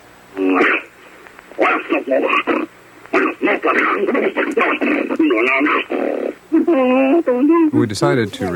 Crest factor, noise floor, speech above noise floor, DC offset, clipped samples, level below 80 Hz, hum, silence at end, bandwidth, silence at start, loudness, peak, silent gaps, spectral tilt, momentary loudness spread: 14 dB; -41 dBFS; 26 dB; under 0.1%; under 0.1%; -60 dBFS; none; 0 s; 16.5 kHz; 0.35 s; -16 LUFS; -2 dBFS; none; -6 dB/octave; 7 LU